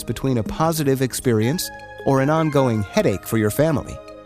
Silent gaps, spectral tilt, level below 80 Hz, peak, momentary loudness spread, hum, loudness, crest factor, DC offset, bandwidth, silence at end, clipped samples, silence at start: none; -6 dB/octave; -44 dBFS; -6 dBFS; 8 LU; none; -20 LUFS; 14 dB; under 0.1%; 15.5 kHz; 0 s; under 0.1%; 0 s